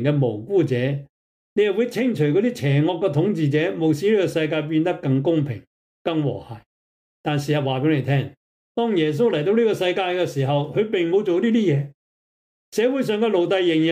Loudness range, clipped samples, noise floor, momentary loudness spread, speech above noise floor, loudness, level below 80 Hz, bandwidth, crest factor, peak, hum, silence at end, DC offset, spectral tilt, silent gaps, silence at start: 4 LU; under 0.1%; under -90 dBFS; 9 LU; over 70 dB; -21 LUFS; -64 dBFS; 15 kHz; 12 dB; -8 dBFS; none; 0 s; under 0.1%; -7 dB/octave; 1.09-1.56 s, 5.67-6.05 s, 6.66-7.24 s, 8.37-8.75 s, 11.94-12.72 s; 0 s